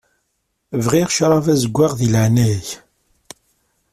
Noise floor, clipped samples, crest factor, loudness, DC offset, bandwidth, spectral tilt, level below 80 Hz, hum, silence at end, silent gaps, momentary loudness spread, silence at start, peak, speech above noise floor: -70 dBFS; under 0.1%; 16 dB; -16 LUFS; under 0.1%; 14.5 kHz; -5.5 dB/octave; -48 dBFS; none; 1.15 s; none; 11 LU; 0.7 s; -2 dBFS; 55 dB